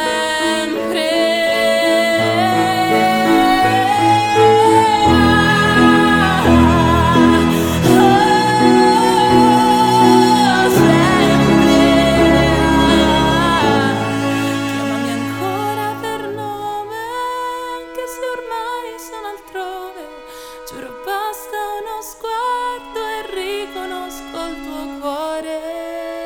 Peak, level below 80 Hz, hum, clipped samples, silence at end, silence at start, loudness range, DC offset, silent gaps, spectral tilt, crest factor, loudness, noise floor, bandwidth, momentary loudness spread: 0 dBFS; -36 dBFS; none; under 0.1%; 0 s; 0 s; 14 LU; under 0.1%; none; -5 dB/octave; 14 dB; -14 LUFS; -34 dBFS; 19 kHz; 16 LU